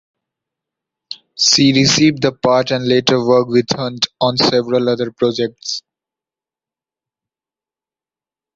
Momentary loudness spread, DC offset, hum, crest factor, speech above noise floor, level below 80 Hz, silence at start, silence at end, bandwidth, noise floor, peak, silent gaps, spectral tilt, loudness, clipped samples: 14 LU; under 0.1%; none; 16 dB; over 76 dB; -54 dBFS; 1.1 s; 2.75 s; 7.8 kHz; under -90 dBFS; 0 dBFS; none; -4 dB/octave; -14 LUFS; under 0.1%